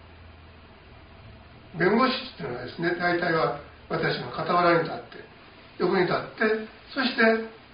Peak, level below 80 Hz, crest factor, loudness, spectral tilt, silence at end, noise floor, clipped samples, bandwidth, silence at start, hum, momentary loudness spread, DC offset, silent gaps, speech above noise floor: -8 dBFS; -56 dBFS; 18 dB; -25 LUFS; -3.5 dB/octave; 0.15 s; -49 dBFS; under 0.1%; 5.2 kHz; 0.05 s; none; 13 LU; under 0.1%; none; 24 dB